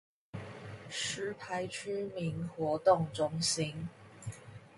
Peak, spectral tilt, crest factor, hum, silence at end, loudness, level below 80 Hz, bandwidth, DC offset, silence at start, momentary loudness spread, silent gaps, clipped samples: -14 dBFS; -4 dB/octave; 22 dB; none; 0 s; -34 LUFS; -66 dBFS; 11.5 kHz; under 0.1%; 0.35 s; 18 LU; none; under 0.1%